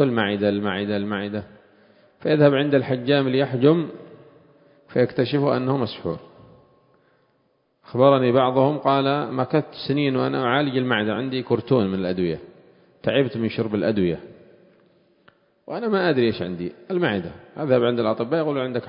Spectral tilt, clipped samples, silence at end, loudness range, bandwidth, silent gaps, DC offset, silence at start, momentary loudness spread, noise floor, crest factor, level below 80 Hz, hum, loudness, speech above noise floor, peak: -11.5 dB/octave; under 0.1%; 0 s; 5 LU; 5.4 kHz; none; under 0.1%; 0 s; 12 LU; -66 dBFS; 20 dB; -56 dBFS; none; -22 LUFS; 45 dB; -2 dBFS